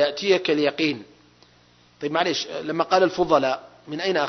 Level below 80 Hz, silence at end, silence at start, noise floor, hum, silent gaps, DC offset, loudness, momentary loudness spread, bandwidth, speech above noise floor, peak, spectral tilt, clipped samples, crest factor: -62 dBFS; 0 s; 0 s; -56 dBFS; 60 Hz at -60 dBFS; none; under 0.1%; -22 LUFS; 11 LU; 6.4 kHz; 34 dB; -4 dBFS; -4.5 dB/octave; under 0.1%; 20 dB